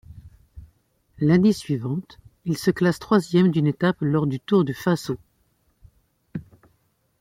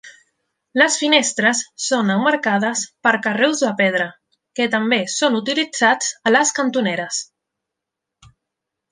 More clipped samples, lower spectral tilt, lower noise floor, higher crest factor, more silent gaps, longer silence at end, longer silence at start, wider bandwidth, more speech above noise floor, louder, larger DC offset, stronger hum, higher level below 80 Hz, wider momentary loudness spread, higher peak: neither; first, -7 dB/octave vs -2.5 dB/octave; second, -67 dBFS vs -83 dBFS; about the same, 18 dB vs 18 dB; neither; second, 0.8 s vs 1.7 s; about the same, 0.15 s vs 0.05 s; first, 15.5 kHz vs 10 kHz; second, 46 dB vs 64 dB; second, -22 LUFS vs -18 LUFS; neither; neither; first, -54 dBFS vs -68 dBFS; first, 16 LU vs 8 LU; second, -6 dBFS vs -2 dBFS